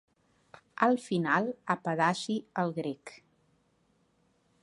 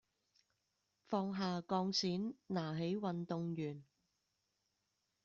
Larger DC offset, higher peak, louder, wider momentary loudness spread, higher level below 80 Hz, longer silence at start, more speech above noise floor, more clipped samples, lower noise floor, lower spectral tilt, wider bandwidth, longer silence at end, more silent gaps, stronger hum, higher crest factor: neither; first, -10 dBFS vs -24 dBFS; first, -30 LUFS vs -40 LUFS; first, 13 LU vs 6 LU; about the same, -80 dBFS vs -80 dBFS; second, 0.8 s vs 1.1 s; second, 41 dB vs 46 dB; neither; second, -71 dBFS vs -85 dBFS; about the same, -5.5 dB/octave vs -5.5 dB/octave; first, 11.5 kHz vs 7.4 kHz; about the same, 1.45 s vs 1.4 s; neither; neither; first, 24 dB vs 18 dB